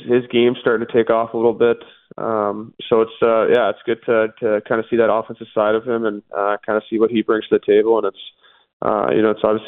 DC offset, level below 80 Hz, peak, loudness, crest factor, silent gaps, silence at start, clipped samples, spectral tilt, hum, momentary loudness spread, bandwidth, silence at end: under 0.1%; -60 dBFS; -2 dBFS; -18 LUFS; 16 dB; 8.73-8.80 s; 0 s; under 0.1%; -9 dB/octave; none; 8 LU; 4 kHz; 0 s